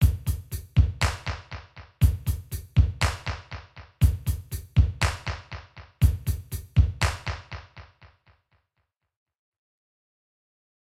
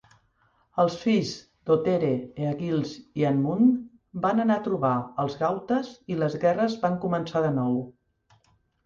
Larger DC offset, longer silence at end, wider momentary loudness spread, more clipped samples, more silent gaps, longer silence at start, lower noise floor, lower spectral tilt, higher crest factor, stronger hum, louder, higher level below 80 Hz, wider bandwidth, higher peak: neither; first, 3 s vs 0.95 s; first, 17 LU vs 9 LU; neither; neither; second, 0 s vs 0.75 s; first, -78 dBFS vs -66 dBFS; second, -5.5 dB/octave vs -7.5 dB/octave; about the same, 20 dB vs 16 dB; neither; about the same, -27 LUFS vs -26 LUFS; first, -32 dBFS vs -64 dBFS; first, 16 kHz vs 7.4 kHz; about the same, -8 dBFS vs -10 dBFS